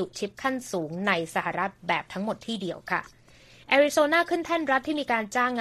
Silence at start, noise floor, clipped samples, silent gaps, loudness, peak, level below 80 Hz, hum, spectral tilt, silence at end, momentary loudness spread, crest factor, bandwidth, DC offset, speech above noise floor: 0 s; -54 dBFS; under 0.1%; none; -26 LUFS; -8 dBFS; -64 dBFS; none; -4 dB/octave; 0 s; 10 LU; 20 dB; 14 kHz; under 0.1%; 27 dB